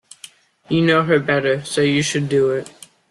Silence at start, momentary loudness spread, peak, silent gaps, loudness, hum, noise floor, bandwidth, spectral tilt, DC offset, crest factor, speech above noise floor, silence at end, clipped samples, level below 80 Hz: 0.7 s; 6 LU; -4 dBFS; none; -18 LUFS; none; -45 dBFS; 12.5 kHz; -5 dB/octave; under 0.1%; 16 dB; 27 dB; 0.4 s; under 0.1%; -58 dBFS